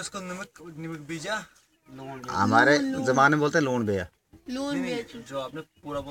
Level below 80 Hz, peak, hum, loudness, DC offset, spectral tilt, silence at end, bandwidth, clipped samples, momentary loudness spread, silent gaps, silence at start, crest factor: -60 dBFS; -6 dBFS; none; -25 LUFS; under 0.1%; -5 dB/octave; 0 s; 16.5 kHz; under 0.1%; 19 LU; none; 0 s; 22 dB